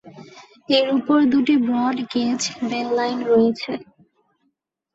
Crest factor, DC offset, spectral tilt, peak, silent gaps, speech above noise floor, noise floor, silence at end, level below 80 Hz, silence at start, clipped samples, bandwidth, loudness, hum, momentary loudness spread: 16 dB; under 0.1%; -4 dB/octave; -4 dBFS; none; 53 dB; -72 dBFS; 1.1 s; -64 dBFS; 0.05 s; under 0.1%; 8 kHz; -20 LUFS; none; 8 LU